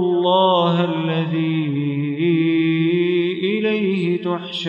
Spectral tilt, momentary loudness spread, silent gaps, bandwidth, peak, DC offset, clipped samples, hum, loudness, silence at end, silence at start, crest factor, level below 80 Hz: -8 dB/octave; 6 LU; none; 7.4 kHz; -4 dBFS; under 0.1%; under 0.1%; none; -19 LUFS; 0 s; 0 s; 14 dB; -70 dBFS